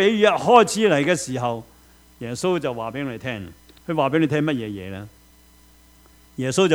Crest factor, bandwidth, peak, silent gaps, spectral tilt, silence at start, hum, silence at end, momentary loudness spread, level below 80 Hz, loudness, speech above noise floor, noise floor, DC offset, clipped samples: 22 dB; over 20 kHz; 0 dBFS; none; -5 dB/octave; 0 s; none; 0 s; 20 LU; -56 dBFS; -21 LUFS; 32 dB; -52 dBFS; under 0.1%; under 0.1%